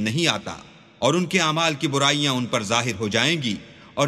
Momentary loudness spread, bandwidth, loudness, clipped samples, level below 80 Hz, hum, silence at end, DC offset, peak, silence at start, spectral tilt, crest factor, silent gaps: 12 LU; 14.5 kHz; -21 LUFS; under 0.1%; -60 dBFS; none; 0 s; under 0.1%; -2 dBFS; 0 s; -3.5 dB/octave; 22 dB; none